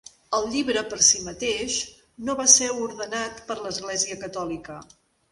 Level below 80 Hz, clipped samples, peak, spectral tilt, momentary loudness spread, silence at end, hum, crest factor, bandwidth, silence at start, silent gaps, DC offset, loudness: -56 dBFS; under 0.1%; -2 dBFS; -0.5 dB/octave; 17 LU; 0.5 s; none; 24 dB; 11.5 kHz; 0.3 s; none; under 0.1%; -22 LUFS